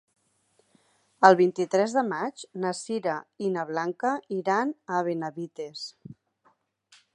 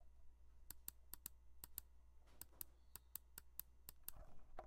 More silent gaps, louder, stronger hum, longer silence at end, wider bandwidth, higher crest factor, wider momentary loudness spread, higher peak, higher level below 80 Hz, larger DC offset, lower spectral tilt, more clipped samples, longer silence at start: neither; first, -26 LUFS vs -57 LUFS; neither; first, 1 s vs 0 s; second, 10.5 kHz vs 16.5 kHz; about the same, 26 dB vs 30 dB; first, 17 LU vs 6 LU; first, -2 dBFS vs -26 dBFS; second, -80 dBFS vs -66 dBFS; neither; first, -5 dB/octave vs -2 dB/octave; neither; first, 1.2 s vs 0 s